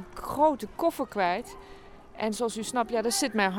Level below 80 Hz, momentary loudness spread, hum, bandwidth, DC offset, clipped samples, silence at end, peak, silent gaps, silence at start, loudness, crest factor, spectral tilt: -54 dBFS; 9 LU; none; 18.5 kHz; under 0.1%; under 0.1%; 0 s; -12 dBFS; none; 0 s; -28 LUFS; 18 dB; -3.5 dB/octave